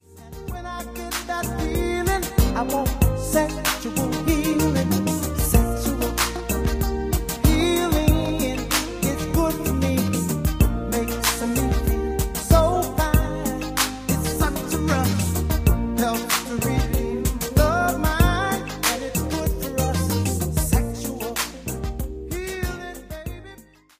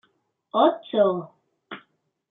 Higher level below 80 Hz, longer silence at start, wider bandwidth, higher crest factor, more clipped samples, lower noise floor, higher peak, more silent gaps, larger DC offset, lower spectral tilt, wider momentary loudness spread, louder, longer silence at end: first, -28 dBFS vs -78 dBFS; second, 0.1 s vs 0.55 s; first, 16 kHz vs 4 kHz; about the same, 20 dB vs 20 dB; neither; second, -47 dBFS vs -69 dBFS; first, -2 dBFS vs -6 dBFS; neither; neither; about the same, -5 dB/octave vs -4.5 dB/octave; second, 9 LU vs 21 LU; about the same, -23 LUFS vs -23 LUFS; second, 0.4 s vs 0.55 s